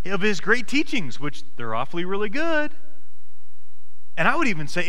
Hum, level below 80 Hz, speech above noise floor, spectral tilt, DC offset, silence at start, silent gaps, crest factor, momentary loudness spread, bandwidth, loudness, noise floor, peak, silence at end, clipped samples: none; -54 dBFS; 39 dB; -4.5 dB/octave; 10%; 0.05 s; none; 22 dB; 13 LU; 16.5 kHz; -24 LUFS; -64 dBFS; -6 dBFS; 0 s; under 0.1%